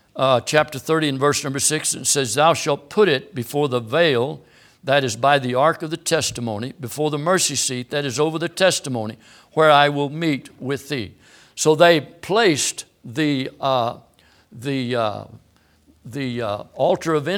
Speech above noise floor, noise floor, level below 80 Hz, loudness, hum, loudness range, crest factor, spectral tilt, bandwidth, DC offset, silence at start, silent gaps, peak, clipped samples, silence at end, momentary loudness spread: 36 dB; -56 dBFS; -62 dBFS; -20 LUFS; none; 6 LU; 20 dB; -3.5 dB/octave; 19 kHz; under 0.1%; 0.15 s; none; 0 dBFS; under 0.1%; 0 s; 12 LU